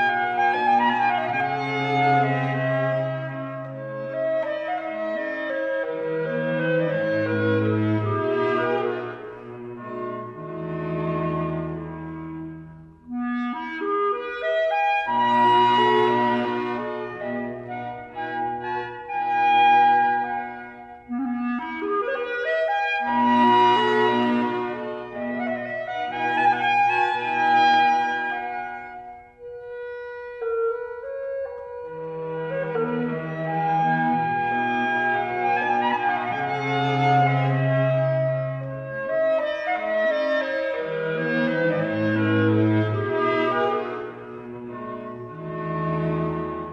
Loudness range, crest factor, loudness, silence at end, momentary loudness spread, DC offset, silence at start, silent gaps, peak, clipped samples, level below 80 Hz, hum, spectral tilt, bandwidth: 8 LU; 16 dB; -23 LUFS; 0 s; 15 LU; under 0.1%; 0 s; none; -8 dBFS; under 0.1%; -60 dBFS; none; -7.5 dB/octave; 8.2 kHz